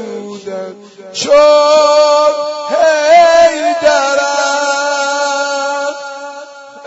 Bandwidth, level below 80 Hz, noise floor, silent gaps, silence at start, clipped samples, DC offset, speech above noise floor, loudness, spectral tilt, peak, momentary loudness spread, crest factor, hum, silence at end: 8 kHz; -52 dBFS; -31 dBFS; none; 0 s; under 0.1%; under 0.1%; 22 dB; -10 LUFS; -1.5 dB/octave; 0 dBFS; 18 LU; 12 dB; none; 0 s